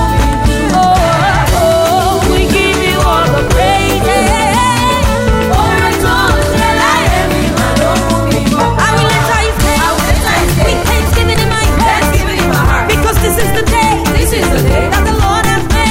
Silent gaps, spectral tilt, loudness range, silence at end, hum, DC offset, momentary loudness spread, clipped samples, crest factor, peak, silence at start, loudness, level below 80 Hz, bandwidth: none; -4.5 dB/octave; 1 LU; 0 s; none; under 0.1%; 2 LU; under 0.1%; 10 dB; 0 dBFS; 0 s; -10 LUFS; -18 dBFS; 16.5 kHz